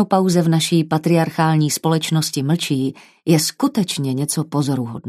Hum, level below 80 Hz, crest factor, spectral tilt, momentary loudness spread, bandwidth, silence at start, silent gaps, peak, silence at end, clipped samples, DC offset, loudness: none; -64 dBFS; 16 dB; -5 dB/octave; 5 LU; 14 kHz; 0 s; none; -2 dBFS; 0 s; under 0.1%; under 0.1%; -18 LUFS